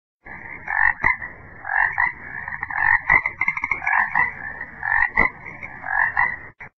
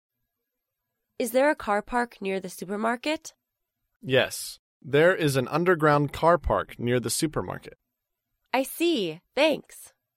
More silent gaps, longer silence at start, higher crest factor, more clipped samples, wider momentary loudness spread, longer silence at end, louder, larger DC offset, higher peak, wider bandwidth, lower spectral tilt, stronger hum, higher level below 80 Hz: second, none vs 3.96-4.00 s, 4.59-4.80 s; second, 0.25 s vs 1.2 s; about the same, 20 dB vs 20 dB; neither; first, 17 LU vs 12 LU; second, 0.1 s vs 0.3 s; first, -20 LUFS vs -25 LUFS; neither; first, -2 dBFS vs -8 dBFS; second, 6.2 kHz vs 16.5 kHz; first, -6 dB/octave vs -4.5 dB/octave; neither; about the same, -46 dBFS vs -50 dBFS